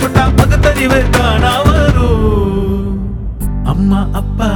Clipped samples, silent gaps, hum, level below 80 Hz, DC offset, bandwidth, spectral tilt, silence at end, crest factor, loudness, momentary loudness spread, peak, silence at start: 0.2%; none; none; -16 dBFS; under 0.1%; 19.5 kHz; -6.5 dB/octave; 0 s; 10 dB; -12 LUFS; 9 LU; 0 dBFS; 0 s